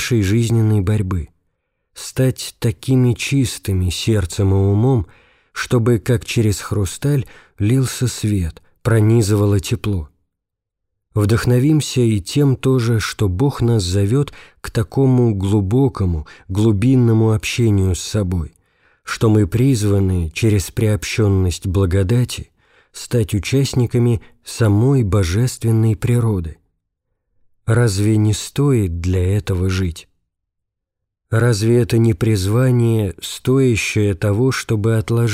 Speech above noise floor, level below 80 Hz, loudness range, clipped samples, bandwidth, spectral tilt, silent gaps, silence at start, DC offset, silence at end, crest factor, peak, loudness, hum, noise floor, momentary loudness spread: 64 dB; -38 dBFS; 3 LU; under 0.1%; 15.5 kHz; -6.5 dB/octave; none; 0 s; under 0.1%; 0 s; 12 dB; -4 dBFS; -17 LUFS; none; -80 dBFS; 9 LU